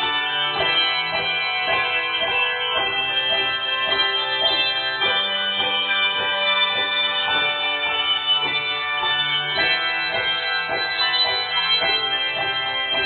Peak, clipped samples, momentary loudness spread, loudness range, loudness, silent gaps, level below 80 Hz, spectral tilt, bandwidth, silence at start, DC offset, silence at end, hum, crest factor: -6 dBFS; under 0.1%; 3 LU; 1 LU; -19 LUFS; none; -58 dBFS; -5 dB/octave; 4.7 kHz; 0 s; under 0.1%; 0 s; none; 14 dB